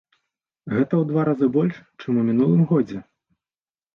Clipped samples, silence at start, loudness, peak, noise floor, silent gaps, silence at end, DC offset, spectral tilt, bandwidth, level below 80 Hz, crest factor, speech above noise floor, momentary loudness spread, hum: under 0.1%; 0.65 s; -21 LUFS; -8 dBFS; under -90 dBFS; none; 0.9 s; under 0.1%; -10.5 dB/octave; 5.8 kHz; -62 dBFS; 14 dB; over 70 dB; 10 LU; none